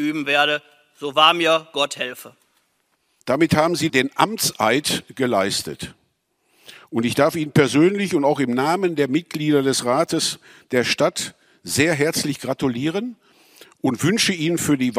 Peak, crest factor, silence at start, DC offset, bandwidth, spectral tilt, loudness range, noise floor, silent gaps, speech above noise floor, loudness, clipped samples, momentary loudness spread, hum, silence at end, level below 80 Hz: 0 dBFS; 20 dB; 0 s; under 0.1%; 16 kHz; -4 dB/octave; 3 LU; -68 dBFS; none; 48 dB; -20 LUFS; under 0.1%; 11 LU; none; 0 s; -58 dBFS